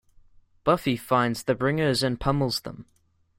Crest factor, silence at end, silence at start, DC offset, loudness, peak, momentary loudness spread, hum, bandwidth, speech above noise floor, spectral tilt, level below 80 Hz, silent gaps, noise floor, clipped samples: 20 dB; 0.55 s; 0.65 s; under 0.1%; -25 LUFS; -6 dBFS; 7 LU; none; 16.5 kHz; 30 dB; -5.5 dB/octave; -48 dBFS; none; -55 dBFS; under 0.1%